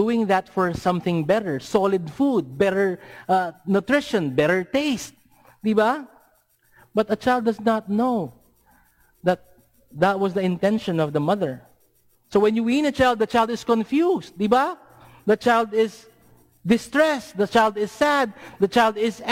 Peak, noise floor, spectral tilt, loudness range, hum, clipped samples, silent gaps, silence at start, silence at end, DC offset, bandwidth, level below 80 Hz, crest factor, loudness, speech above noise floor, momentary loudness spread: -6 dBFS; -61 dBFS; -6 dB/octave; 3 LU; none; under 0.1%; none; 0 s; 0 s; under 0.1%; 16.5 kHz; -56 dBFS; 16 dB; -22 LUFS; 40 dB; 7 LU